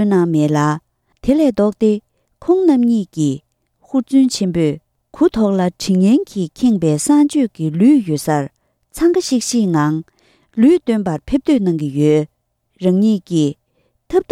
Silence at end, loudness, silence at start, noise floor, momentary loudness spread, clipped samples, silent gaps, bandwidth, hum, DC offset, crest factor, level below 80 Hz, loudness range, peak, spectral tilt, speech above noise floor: 0.1 s; -16 LUFS; 0 s; -63 dBFS; 8 LU; under 0.1%; none; 15 kHz; none; under 0.1%; 12 dB; -46 dBFS; 2 LU; -2 dBFS; -6.5 dB/octave; 49 dB